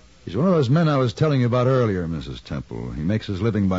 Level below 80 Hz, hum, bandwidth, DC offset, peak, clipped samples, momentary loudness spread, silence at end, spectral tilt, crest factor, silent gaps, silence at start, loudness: -44 dBFS; none; 7.8 kHz; 0.2%; -8 dBFS; under 0.1%; 13 LU; 0 s; -8 dB/octave; 12 dB; none; 0.25 s; -21 LUFS